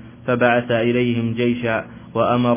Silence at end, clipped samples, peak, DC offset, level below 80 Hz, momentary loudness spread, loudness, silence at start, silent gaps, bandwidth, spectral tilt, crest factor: 0 s; under 0.1%; -2 dBFS; under 0.1%; -50 dBFS; 7 LU; -19 LUFS; 0 s; none; 3.6 kHz; -10.5 dB/octave; 16 dB